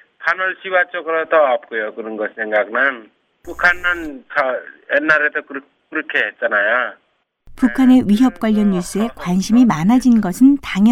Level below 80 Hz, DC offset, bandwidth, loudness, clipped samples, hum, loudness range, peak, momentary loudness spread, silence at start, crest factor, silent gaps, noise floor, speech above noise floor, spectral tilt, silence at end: -44 dBFS; under 0.1%; 14.5 kHz; -16 LUFS; under 0.1%; none; 4 LU; -2 dBFS; 12 LU; 0.2 s; 14 dB; none; -46 dBFS; 30 dB; -6 dB/octave; 0 s